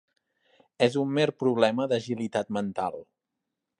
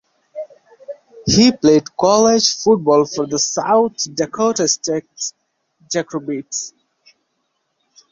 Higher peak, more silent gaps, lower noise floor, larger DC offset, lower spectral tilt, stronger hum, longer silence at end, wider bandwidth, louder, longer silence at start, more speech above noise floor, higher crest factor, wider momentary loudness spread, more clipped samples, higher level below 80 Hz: second, -8 dBFS vs 0 dBFS; neither; first, -85 dBFS vs -70 dBFS; neither; first, -6 dB/octave vs -3.5 dB/octave; neither; second, 0.75 s vs 1.4 s; first, 11 kHz vs 7.8 kHz; second, -27 LUFS vs -16 LUFS; first, 0.8 s vs 0.35 s; first, 58 dB vs 54 dB; first, 22 dB vs 16 dB; second, 8 LU vs 21 LU; neither; second, -70 dBFS vs -50 dBFS